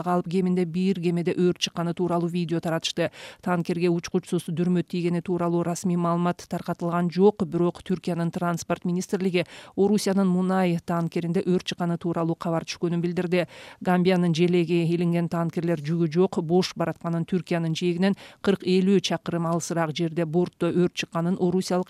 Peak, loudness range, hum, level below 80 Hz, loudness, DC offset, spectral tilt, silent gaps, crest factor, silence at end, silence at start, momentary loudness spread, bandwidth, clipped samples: -8 dBFS; 2 LU; none; -62 dBFS; -25 LUFS; under 0.1%; -6.5 dB/octave; none; 16 dB; 0.05 s; 0 s; 6 LU; 13 kHz; under 0.1%